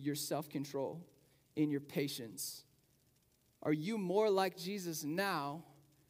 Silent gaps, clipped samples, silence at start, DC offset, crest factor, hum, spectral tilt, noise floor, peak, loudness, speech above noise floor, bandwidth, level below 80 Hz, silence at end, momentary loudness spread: none; under 0.1%; 0 s; under 0.1%; 20 dB; none; -4.5 dB/octave; -74 dBFS; -20 dBFS; -38 LUFS; 36 dB; 16 kHz; -84 dBFS; 0.4 s; 11 LU